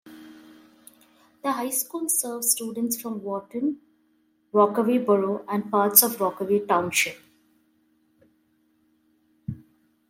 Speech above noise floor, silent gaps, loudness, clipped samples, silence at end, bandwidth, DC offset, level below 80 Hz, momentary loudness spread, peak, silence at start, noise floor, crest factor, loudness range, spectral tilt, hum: 43 dB; none; -23 LUFS; under 0.1%; 0.55 s; 16.5 kHz; under 0.1%; -70 dBFS; 16 LU; 0 dBFS; 0.05 s; -66 dBFS; 26 dB; 7 LU; -3 dB/octave; none